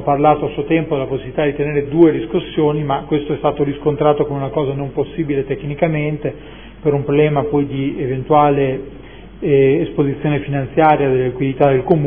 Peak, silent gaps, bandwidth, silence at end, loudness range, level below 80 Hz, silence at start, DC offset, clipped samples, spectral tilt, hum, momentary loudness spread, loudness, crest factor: 0 dBFS; none; 3.6 kHz; 0 s; 3 LU; -40 dBFS; 0 s; 0.5%; under 0.1%; -12 dB/octave; none; 9 LU; -17 LUFS; 16 dB